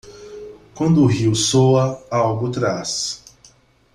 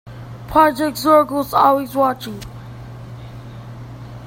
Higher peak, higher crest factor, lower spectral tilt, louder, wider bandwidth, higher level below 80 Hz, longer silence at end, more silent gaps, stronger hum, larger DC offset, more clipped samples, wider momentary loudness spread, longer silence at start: second, -4 dBFS vs 0 dBFS; about the same, 16 dB vs 18 dB; about the same, -5.5 dB/octave vs -5.5 dB/octave; about the same, -18 LUFS vs -16 LUFS; second, 13 kHz vs 16.5 kHz; second, -50 dBFS vs -44 dBFS; first, 0.8 s vs 0 s; neither; neither; neither; neither; about the same, 22 LU vs 21 LU; about the same, 0.05 s vs 0.05 s